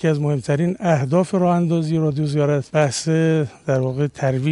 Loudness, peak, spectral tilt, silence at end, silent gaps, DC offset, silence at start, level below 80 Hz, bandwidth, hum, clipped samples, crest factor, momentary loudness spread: -19 LUFS; -4 dBFS; -7 dB/octave; 0 s; none; under 0.1%; 0 s; -54 dBFS; 11.5 kHz; none; under 0.1%; 16 dB; 4 LU